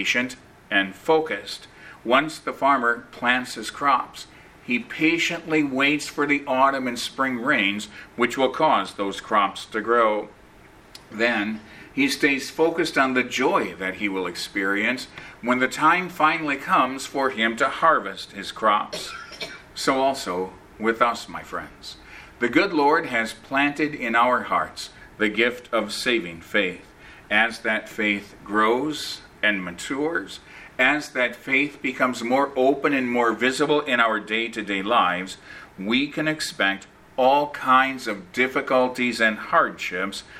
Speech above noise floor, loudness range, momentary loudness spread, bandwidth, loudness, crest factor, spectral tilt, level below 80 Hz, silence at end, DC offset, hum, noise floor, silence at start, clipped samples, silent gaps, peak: 27 dB; 3 LU; 13 LU; 16 kHz; -22 LUFS; 22 dB; -3.5 dB/octave; -58 dBFS; 0 s; under 0.1%; none; -49 dBFS; 0 s; under 0.1%; none; -2 dBFS